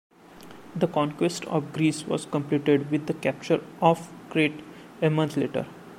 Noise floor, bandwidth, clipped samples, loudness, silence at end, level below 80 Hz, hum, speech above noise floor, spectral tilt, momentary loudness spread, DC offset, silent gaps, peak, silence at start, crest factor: -47 dBFS; 15.5 kHz; under 0.1%; -26 LUFS; 0 s; -66 dBFS; none; 22 dB; -6 dB/octave; 7 LU; under 0.1%; none; -4 dBFS; 0.3 s; 22 dB